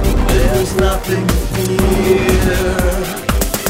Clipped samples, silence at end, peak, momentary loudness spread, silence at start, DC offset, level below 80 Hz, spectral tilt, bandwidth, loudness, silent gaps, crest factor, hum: under 0.1%; 0 s; 0 dBFS; 5 LU; 0 s; under 0.1%; -18 dBFS; -5 dB/octave; 16.5 kHz; -15 LUFS; none; 14 dB; none